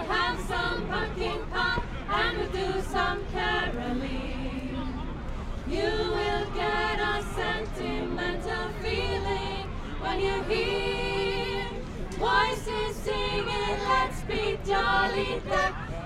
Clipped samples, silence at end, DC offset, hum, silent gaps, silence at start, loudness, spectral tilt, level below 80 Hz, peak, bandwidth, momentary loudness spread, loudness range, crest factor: under 0.1%; 0 s; under 0.1%; none; none; 0 s; -29 LUFS; -5 dB/octave; -36 dBFS; -12 dBFS; 14 kHz; 8 LU; 3 LU; 18 dB